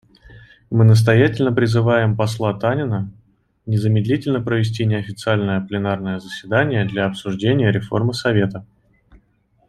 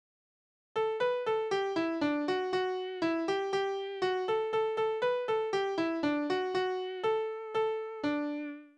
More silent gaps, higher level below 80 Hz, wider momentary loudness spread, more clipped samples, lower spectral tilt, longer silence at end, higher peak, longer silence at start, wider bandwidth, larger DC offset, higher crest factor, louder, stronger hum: neither; first, -52 dBFS vs -74 dBFS; first, 9 LU vs 4 LU; neither; first, -7 dB/octave vs -5 dB/octave; first, 1.05 s vs 0.1 s; first, -2 dBFS vs -20 dBFS; second, 0.3 s vs 0.75 s; first, 12 kHz vs 9.8 kHz; neither; about the same, 16 dB vs 14 dB; first, -18 LUFS vs -32 LUFS; neither